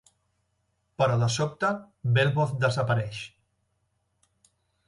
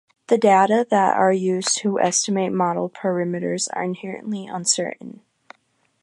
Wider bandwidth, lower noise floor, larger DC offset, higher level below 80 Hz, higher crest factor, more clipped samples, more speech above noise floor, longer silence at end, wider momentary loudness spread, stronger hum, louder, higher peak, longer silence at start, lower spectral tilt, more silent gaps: about the same, 11.5 kHz vs 11.5 kHz; first, -74 dBFS vs -66 dBFS; neither; first, -60 dBFS vs -74 dBFS; about the same, 18 dB vs 18 dB; neither; about the same, 49 dB vs 46 dB; first, 1.6 s vs 0.95 s; about the same, 11 LU vs 13 LU; neither; second, -26 LUFS vs -20 LUFS; second, -10 dBFS vs -4 dBFS; first, 1 s vs 0.3 s; first, -5.5 dB/octave vs -3.5 dB/octave; neither